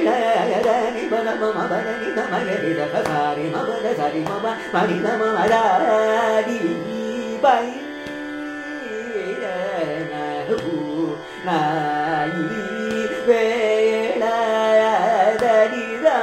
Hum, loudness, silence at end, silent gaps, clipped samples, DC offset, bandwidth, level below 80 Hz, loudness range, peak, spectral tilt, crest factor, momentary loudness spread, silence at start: none; -21 LUFS; 0 s; none; under 0.1%; under 0.1%; 15 kHz; -60 dBFS; 6 LU; -4 dBFS; -5.5 dB/octave; 16 dB; 10 LU; 0 s